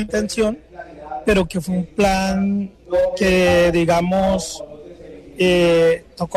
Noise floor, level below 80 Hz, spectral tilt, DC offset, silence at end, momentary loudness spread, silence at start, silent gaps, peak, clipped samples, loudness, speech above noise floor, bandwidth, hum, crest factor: -38 dBFS; -38 dBFS; -5.5 dB/octave; under 0.1%; 0 s; 19 LU; 0 s; none; -6 dBFS; under 0.1%; -18 LUFS; 21 dB; 15.5 kHz; none; 12 dB